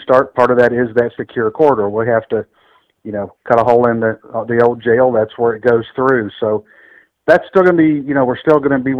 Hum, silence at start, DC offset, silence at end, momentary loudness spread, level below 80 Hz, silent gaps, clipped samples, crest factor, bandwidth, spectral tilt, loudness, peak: none; 0 s; under 0.1%; 0 s; 11 LU; -52 dBFS; none; 0.3%; 14 dB; 6.6 kHz; -8.5 dB/octave; -14 LUFS; 0 dBFS